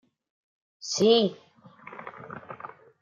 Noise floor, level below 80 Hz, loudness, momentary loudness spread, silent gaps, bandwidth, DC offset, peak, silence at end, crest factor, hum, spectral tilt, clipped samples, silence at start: -49 dBFS; -78 dBFS; -23 LUFS; 22 LU; none; 7.6 kHz; under 0.1%; -8 dBFS; 0.35 s; 22 dB; none; -4 dB/octave; under 0.1%; 0.85 s